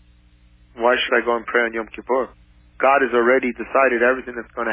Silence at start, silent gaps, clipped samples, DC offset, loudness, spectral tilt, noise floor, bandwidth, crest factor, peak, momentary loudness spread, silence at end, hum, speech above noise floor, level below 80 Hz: 0.75 s; none; under 0.1%; under 0.1%; -19 LUFS; -7.5 dB/octave; -52 dBFS; 3.7 kHz; 16 dB; -4 dBFS; 10 LU; 0 s; none; 33 dB; -52 dBFS